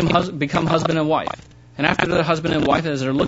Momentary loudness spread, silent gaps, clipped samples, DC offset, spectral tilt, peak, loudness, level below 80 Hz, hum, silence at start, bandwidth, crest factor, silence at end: 6 LU; none; under 0.1%; under 0.1%; -6 dB/octave; 0 dBFS; -19 LUFS; -44 dBFS; none; 0 s; 8 kHz; 20 dB; 0 s